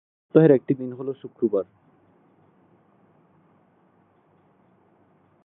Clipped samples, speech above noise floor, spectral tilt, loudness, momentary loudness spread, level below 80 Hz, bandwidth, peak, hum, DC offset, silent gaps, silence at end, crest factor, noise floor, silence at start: under 0.1%; 40 dB; -13 dB/octave; -22 LUFS; 17 LU; -76 dBFS; 4 kHz; -4 dBFS; none; under 0.1%; none; 3.8 s; 24 dB; -61 dBFS; 0.35 s